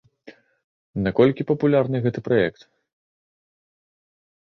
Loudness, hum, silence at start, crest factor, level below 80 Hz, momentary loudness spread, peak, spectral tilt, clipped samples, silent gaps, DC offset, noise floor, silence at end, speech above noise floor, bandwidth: -21 LUFS; none; 0.25 s; 20 dB; -54 dBFS; 8 LU; -4 dBFS; -9 dB/octave; under 0.1%; 0.64-0.94 s; under 0.1%; -49 dBFS; 1.9 s; 29 dB; 6.2 kHz